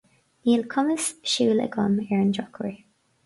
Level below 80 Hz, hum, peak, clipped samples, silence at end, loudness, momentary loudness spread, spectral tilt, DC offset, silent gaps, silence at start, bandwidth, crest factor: -64 dBFS; none; -8 dBFS; under 0.1%; 0.5 s; -24 LUFS; 10 LU; -4.5 dB/octave; under 0.1%; none; 0.45 s; 11.5 kHz; 16 dB